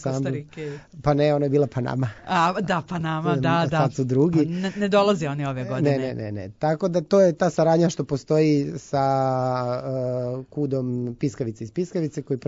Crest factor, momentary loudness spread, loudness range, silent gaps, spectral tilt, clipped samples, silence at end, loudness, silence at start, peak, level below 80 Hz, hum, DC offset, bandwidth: 16 dB; 9 LU; 3 LU; none; -7 dB/octave; under 0.1%; 0.1 s; -23 LUFS; 0 s; -8 dBFS; -54 dBFS; none; under 0.1%; 7.8 kHz